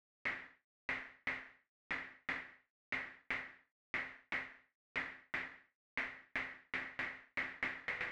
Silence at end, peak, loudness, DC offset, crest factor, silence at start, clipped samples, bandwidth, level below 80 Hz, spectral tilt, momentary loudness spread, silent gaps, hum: 0 s; -24 dBFS; -43 LUFS; under 0.1%; 20 dB; 0.25 s; under 0.1%; 11 kHz; -72 dBFS; -3.5 dB/octave; 8 LU; 0.64-0.89 s, 1.69-1.90 s, 2.70-2.92 s, 3.72-3.94 s, 4.75-4.95 s, 5.75-5.97 s; none